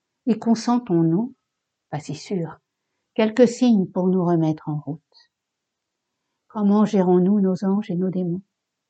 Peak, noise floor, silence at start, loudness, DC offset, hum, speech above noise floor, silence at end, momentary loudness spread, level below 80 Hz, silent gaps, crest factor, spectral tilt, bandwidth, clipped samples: -2 dBFS; -81 dBFS; 0.25 s; -21 LUFS; under 0.1%; none; 61 dB; 0.5 s; 15 LU; -74 dBFS; none; 20 dB; -7.5 dB/octave; 8.6 kHz; under 0.1%